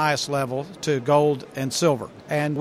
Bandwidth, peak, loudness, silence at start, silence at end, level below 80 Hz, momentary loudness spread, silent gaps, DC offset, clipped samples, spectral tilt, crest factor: 15 kHz; -6 dBFS; -23 LUFS; 0 s; 0 s; -62 dBFS; 9 LU; none; under 0.1%; under 0.1%; -5 dB/octave; 18 dB